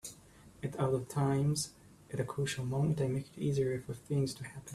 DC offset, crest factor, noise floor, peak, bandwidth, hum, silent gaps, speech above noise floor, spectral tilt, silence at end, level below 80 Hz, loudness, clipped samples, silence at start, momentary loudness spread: under 0.1%; 16 dB; -58 dBFS; -20 dBFS; 13.5 kHz; none; none; 24 dB; -6 dB/octave; 0 s; -62 dBFS; -35 LUFS; under 0.1%; 0.05 s; 10 LU